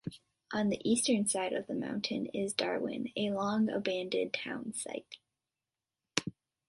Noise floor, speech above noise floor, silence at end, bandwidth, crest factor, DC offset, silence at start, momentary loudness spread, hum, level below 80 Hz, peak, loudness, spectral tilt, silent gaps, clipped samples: under -90 dBFS; over 56 dB; 0.4 s; 12 kHz; 28 dB; under 0.1%; 0.05 s; 11 LU; none; -72 dBFS; -8 dBFS; -34 LUFS; -3.5 dB/octave; none; under 0.1%